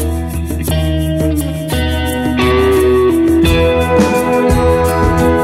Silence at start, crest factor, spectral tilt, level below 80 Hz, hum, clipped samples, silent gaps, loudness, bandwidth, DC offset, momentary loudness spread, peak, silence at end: 0 s; 12 dB; -6 dB/octave; -22 dBFS; none; under 0.1%; none; -13 LUFS; 16 kHz; under 0.1%; 7 LU; 0 dBFS; 0 s